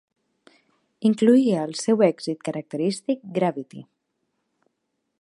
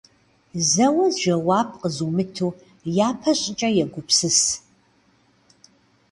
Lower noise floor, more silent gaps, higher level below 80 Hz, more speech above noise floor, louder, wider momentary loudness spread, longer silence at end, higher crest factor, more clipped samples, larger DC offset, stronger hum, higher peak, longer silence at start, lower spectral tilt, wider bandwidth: first, -77 dBFS vs -60 dBFS; neither; second, -78 dBFS vs -60 dBFS; first, 55 dB vs 39 dB; about the same, -22 LUFS vs -21 LUFS; first, 13 LU vs 10 LU; about the same, 1.4 s vs 1.5 s; about the same, 20 dB vs 18 dB; neither; neither; neither; about the same, -4 dBFS vs -4 dBFS; first, 1 s vs 0.55 s; first, -6 dB/octave vs -3.5 dB/octave; about the same, 11.5 kHz vs 11.5 kHz